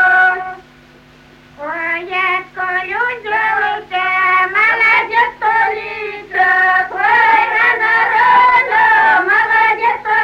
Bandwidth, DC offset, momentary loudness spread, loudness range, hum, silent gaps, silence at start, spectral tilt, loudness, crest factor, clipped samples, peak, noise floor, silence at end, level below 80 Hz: 13.5 kHz; under 0.1%; 9 LU; 8 LU; none; none; 0 s; -3.5 dB/octave; -12 LUFS; 12 dB; under 0.1%; -2 dBFS; -43 dBFS; 0 s; -52 dBFS